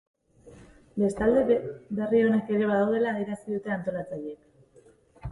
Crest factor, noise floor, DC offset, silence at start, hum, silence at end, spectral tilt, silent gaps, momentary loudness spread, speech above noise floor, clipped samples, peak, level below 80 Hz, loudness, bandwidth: 16 dB; -58 dBFS; under 0.1%; 0.45 s; none; 0 s; -7.5 dB/octave; none; 14 LU; 32 dB; under 0.1%; -12 dBFS; -54 dBFS; -26 LUFS; 11.5 kHz